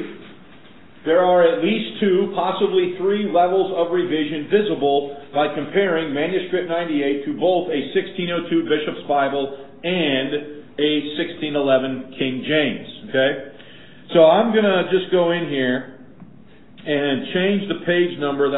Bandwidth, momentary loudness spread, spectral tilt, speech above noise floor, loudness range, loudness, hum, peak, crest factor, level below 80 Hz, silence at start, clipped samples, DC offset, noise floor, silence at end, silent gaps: 4.1 kHz; 9 LU; -10.5 dB/octave; 28 dB; 3 LU; -20 LUFS; none; -2 dBFS; 18 dB; -62 dBFS; 0 s; under 0.1%; 0.7%; -47 dBFS; 0 s; none